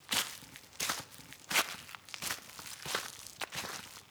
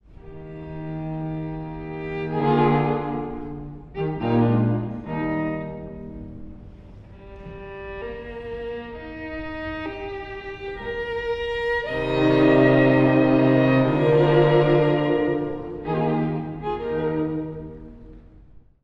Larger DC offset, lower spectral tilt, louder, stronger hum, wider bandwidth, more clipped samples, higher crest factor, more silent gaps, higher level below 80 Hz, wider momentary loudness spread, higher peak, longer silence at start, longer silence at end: neither; second, 0 dB/octave vs -9 dB/octave; second, -37 LUFS vs -22 LUFS; neither; first, over 20 kHz vs 6 kHz; neither; first, 26 dB vs 18 dB; neither; second, -70 dBFS vs -44 dBFS; second, 15 LU vs 20 LU; second, -14 dBFS vs -4 dBFS; about the same, 0 s vs 0.1 s; second, 0 s vs 0.25 s